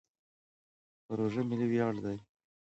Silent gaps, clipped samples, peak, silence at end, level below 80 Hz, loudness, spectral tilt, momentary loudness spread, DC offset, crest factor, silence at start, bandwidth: none; under 0.1%; -18 dBFS; 0.55 s; -70 dBFS; -34 LUFS; -8.5 dB/octave; 10 LU; under 0.1%; 18 dB; 1.1 s; 8 kHz